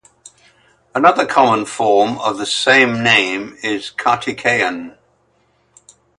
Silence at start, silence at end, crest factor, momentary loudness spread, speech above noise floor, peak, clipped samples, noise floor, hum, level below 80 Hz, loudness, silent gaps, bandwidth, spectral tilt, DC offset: 0.95 s; 1.3 s; 18 dB; 11 LU; 44 dB; 0 dBFS; under 0.1%; -59 dBFS; none; -60 dBFS; -15 LUFS; none; 11.5 kHz; -3.5 dB/octave; under 0.1%